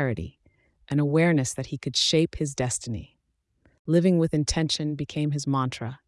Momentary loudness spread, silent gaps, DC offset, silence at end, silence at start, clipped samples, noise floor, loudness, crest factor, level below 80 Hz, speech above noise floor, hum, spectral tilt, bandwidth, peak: 11 LU; 3.79-3.85 s; under 0.1%; 0.1 s; 0 s; under 0.1%; -73 dBFS; -25 LUFS; 16 dB; -48 dBFS; 48 dB; none; -5 dB/octave; 12 kHz; -10 dBFS